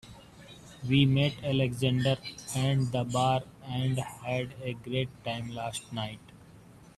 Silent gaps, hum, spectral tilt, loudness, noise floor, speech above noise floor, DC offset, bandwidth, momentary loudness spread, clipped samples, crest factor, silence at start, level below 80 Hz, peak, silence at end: none; none; -6 dB/octave; -30 LUFS; -53 dBFS; 24 dB; under 0.1%; 13 kHz; 14 LU; under 0.1%; 20 dB; 0.05 s; -58 dBFS; -12 dBFS; 0.15 s